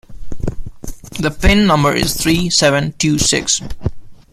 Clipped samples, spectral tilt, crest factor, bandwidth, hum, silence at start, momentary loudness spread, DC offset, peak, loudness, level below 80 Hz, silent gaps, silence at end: under 0.1%; -3.5 dB/octave; 16 dB; 16 kHz; none; 0.1 s; 15 LU; under 0.1%; 0 dBFS; -14 LUFS; -26 dBFS; none; 0.15 s